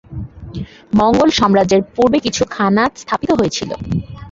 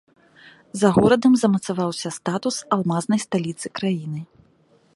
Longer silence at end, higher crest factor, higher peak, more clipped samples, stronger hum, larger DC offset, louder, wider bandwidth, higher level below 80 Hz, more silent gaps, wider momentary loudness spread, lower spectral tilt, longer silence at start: second, 0 s vs 0.7 s; second, 14 dB vs 20 dB; about the same, -2 dBFS vs -2 dBFS; neither; neither; neither; first, -15 LUFS vs -21 LUFS; second, 7.8 kHz vs 11.5 kHz; first, -38 dBFS vs -56 dBFS; neither; first, 17 LU vs 12 LU; about the same, -5 dB/octave vs -5.5 dB/octave; second, 0.1 s vs 0.45 s